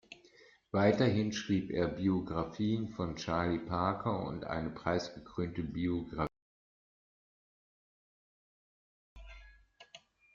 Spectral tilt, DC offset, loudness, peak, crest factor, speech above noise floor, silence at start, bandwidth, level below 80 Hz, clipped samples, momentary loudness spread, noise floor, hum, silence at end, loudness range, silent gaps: -6 dB/octave; under 0.1%; -35 LUFS; -16 dBFS; 20 dB; 29 dB; 0.1 s; 7.4 kHz; -58 dBFS; under 0.1%; 10 LU; -63 dBFS; none; 0.35 s; 10 LU; 6.42-9.16 s